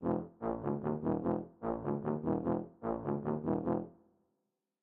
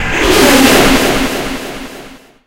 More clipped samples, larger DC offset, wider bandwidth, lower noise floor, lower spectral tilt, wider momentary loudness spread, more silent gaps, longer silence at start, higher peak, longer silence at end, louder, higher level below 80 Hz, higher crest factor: second, under 0.1% vs 0.7%; neither; second, 3.4 kHz vs over 20 kHz; first, -85 dBFS vs -34 dBFS; first, -12.5 dB/octave vs -3 dB/octave; second, 5 LU vs 19 LU; neither; about the same, 0 s vs 0 s; second, -20 dBFS vs 0 dBFS; first, 0.9 s vs 0.35 s; second, -37 LUFS vs -9 LUFS; second, -62 dBFS vs -26 dBFS; about the same, 16 dB vs 12 dB